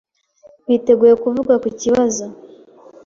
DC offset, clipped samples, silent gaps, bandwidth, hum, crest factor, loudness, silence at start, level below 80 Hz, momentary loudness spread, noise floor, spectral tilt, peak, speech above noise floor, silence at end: under 0.1%; under 0.1%; none; 7.6 kHz; none; 16 dB; -15 LUFS; 0.7 s; -54 dBFS; 14 LU; -49 dBFS; -5 dB/octave; -2 dBFS; 34 dB; 0.6 s